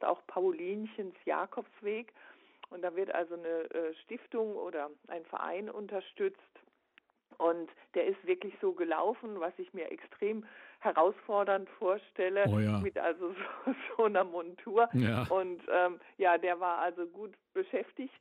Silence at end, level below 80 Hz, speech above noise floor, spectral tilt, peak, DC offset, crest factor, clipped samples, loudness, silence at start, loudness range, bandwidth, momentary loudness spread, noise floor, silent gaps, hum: 0.1 s; -72 dBFS; 35 dB; -8 dB/octave; -14 dBFS; under 0.1%; 20 dB; under 0.1%; -34 LUFS; 0 s; 7 LU; 10.5 kHz; 12 LU; -69 dBFS; none; none